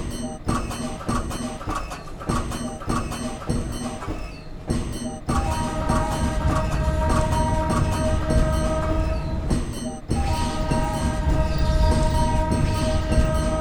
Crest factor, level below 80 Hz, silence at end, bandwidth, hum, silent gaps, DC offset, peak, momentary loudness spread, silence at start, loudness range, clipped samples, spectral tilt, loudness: 16 dB; -26 dBFS; 0 s; over 20 kHz; none; none; under 0.1%; -6 dBFS; 9 LU; 0 s; 6 LU; under 0.1%; -6 dB/octave; -25 LUFS